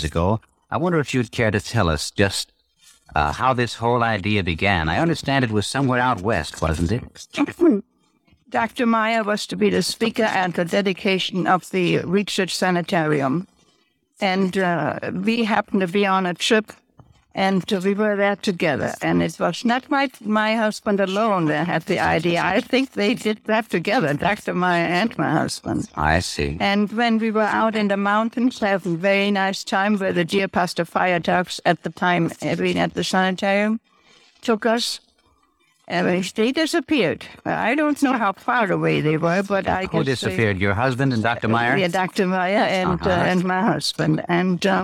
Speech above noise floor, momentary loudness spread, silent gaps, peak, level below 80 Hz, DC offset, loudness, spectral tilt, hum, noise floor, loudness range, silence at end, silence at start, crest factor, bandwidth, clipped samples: 43 dB; 4 LU; none; -2 dBFS; -44 dBFS; under 0.1%; -21 LUFS; -5.5 dB/octave; none; -63 dBFS; 2 LU; 0 s; 0 s; 20 dB; 16 kHz; under 0.1%